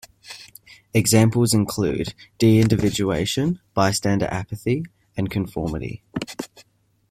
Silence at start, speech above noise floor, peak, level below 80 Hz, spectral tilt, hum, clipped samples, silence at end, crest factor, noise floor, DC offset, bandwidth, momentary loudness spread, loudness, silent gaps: 0.25 s; 38 dB; -4 dBFS; -46 dBFS; -5.5 dB/octave; none; under 0.1%; 0.5 s; 18 dB; -58 dBFS; under 0.1%; 15.5 kHz; 16 LU; -21 LUFS; none